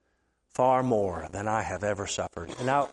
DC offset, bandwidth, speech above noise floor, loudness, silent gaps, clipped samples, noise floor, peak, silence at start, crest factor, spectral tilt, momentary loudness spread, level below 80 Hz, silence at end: under 0.1%; 11.5 kHz; 46 dB; -29 LUFS; none; under 0.1%; -73 dBFS; -12 dBFS; 0.6 s; 18 dB; -5 dB/octave; 9 LU; -58 dBFS; 0 s